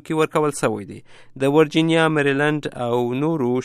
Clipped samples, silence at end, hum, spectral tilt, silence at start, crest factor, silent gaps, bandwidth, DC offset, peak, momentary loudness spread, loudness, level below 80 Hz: under 0.1%; 0 s; none; -6 dB/octave; 0.05 s; 16 dB; none; 14 kHz; under 0.1%; -4 dBFS; 7 LU; -20 LUFS; -60 dBFS